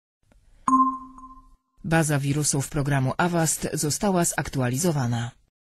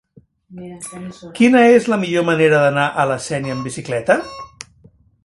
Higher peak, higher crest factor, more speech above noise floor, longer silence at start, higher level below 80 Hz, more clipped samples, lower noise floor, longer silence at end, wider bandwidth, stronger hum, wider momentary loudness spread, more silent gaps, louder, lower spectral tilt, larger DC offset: second, -6 dBFS vs 0 dBFS; about the same, 18 dB vs 16 dB; second, 29 dB vs 35 dB; first, 0.65 s vs 0.5 s; first, -48 dBFS vs -56 dBFS; neither; about the same, -52 dBFS vs -51 dBFS; second, 0.4 s vs 0.8 s; first, 15.5 kHz vs 11.5 kHz; neither; second, 9 LU vs 21 LU; neither; second, -24 LUFS vs -15 LUFS; about the same, -4.5 dB/octave vs -5.5 dB/octave; neither